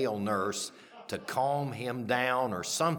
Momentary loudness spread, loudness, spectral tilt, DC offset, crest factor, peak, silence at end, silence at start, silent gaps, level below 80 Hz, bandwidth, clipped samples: 11 LU; -32 LUFS; -4 dB/octave; under 0.1%; 18 dB; -14 dBFS; 0 s; 0 s; none; -74 dBFS; 19 kHz; under 0.1%